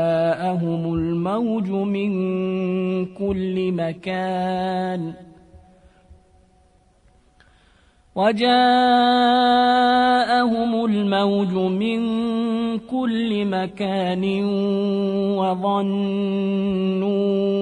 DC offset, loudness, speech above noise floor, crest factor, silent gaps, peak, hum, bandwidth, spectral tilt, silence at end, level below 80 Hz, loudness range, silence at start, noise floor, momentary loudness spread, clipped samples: under 0.1%; -20 LUFS; 37 dB; 14 dB; none; -6 dBFS; none; 10 kHz; -7 dB/octave; 0 s; -54 dBFS; 11 LU; 0 s; -57 dBFS; 8 LU; under 0.1%